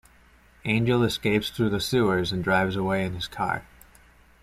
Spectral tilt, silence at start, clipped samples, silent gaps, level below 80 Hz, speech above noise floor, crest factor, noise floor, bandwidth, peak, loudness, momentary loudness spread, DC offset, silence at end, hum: -5.5 dB/octave; 0.65 s; under 0.1%; none; -50 dBFS; 32 dB; 16 dB; -56 dBFS; 15 kHz; -10 dBFS; -25 LUFS; 6 LU; under 0.1%; 0.8 s; none